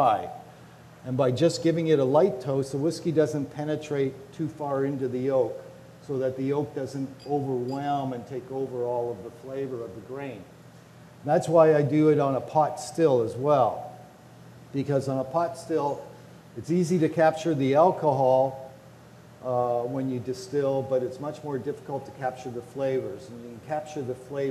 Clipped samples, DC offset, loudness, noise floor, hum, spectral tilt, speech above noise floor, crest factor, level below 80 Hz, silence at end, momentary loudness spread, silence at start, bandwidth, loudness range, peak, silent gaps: under 0.1%; under 0.1%; -26 LUFS; -49 dBFS; none; -7 dB/octave; 24 dB; 20 dB; -68 dBFS; 0 s; 16 LU; 0 s; 13.5 kHz; 8 LU; -8 dBFS; none